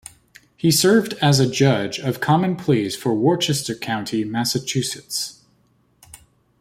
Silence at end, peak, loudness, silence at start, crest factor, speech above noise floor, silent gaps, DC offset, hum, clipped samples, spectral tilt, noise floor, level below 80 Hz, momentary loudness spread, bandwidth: 0.45 s; -4 dBFS; -20 LUFS; 0.65 s; 18 dB; 41 dB; none; under 0.1%; none; under 0.1%; -4.5 dB/octave; -61 dBFS; -58 dBFS; 9 LU; 16 kHz